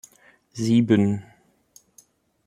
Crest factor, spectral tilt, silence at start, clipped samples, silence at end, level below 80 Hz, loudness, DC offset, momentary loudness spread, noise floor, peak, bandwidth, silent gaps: 20 dB; -7 dB/octave; 0.55 s; under 0.1%; 1.25 s; -64 dBFS; -21 LUFS; under 0.1%; 15 LU; -58 dBFS; -6 dBFS; 12 kHz; none